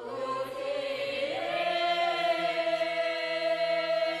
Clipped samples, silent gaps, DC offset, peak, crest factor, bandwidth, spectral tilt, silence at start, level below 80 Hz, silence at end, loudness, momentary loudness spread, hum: under 0.1%; none; under 0.1%; -16 dBFS; 14 dB; 13 kHz; -3 dB/octave; 0 s; -70 dBFS; 0 s; -29 LUFS; 6 LU; none